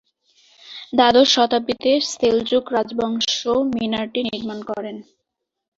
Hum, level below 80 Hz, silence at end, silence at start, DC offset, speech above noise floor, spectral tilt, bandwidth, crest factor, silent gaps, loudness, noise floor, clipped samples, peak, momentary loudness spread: none; -56 dBFS; 0.75 s; 0.65 s; under 0.1%; 60 dB; -3 dB/octave; 8 kHz; 18 dB; none; -19 LUFS; -79 dBFS; under 0.1%; -2 dBFS; 15 LU